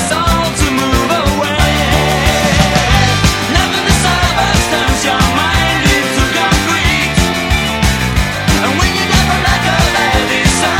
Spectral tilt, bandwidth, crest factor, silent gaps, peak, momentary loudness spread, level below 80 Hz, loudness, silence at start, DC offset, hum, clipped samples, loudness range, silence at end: -4 dB/octave; 17 kHz; 12 dB; none; 0 dBFS; 2 LU; -20 dBFS; -11 LUFS; 0 s; under 0.1%; none; under 0.1%; 1 LU; 0 s